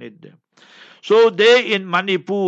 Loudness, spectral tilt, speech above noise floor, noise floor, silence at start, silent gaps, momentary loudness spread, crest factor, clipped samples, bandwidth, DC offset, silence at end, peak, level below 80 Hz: -15 LUFS; -4.5 dB/octave; 30 dB; -46 dBFS; 0 s; none; 8 LU; 16 dB; under 0.1%; 8 kHz; under 0.1%; 0 s; -2 dBFS; -72 dBFS